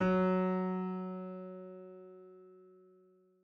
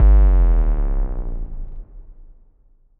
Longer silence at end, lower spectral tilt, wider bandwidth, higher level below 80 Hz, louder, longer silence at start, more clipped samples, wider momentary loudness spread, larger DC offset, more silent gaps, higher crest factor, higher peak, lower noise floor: about the same, 0.75 s vs 0.85 s; about the same, -9.5 dB/octave vs -10.5 dB/octave; first, 5 kHz vs 2.3 kHz; second, -68 dBFS vs -16 dBFS; second, -35 LUFS vs -20 LUFS; about the same, 0 s vs 0 s; neither; about the same, 25 LU vs 23 LU; neither; neither; about the same, 16 dB vs 12 dB; second, -20 dBFS vs -4 dBFS; first, -66 dBFS vs -53 dBFS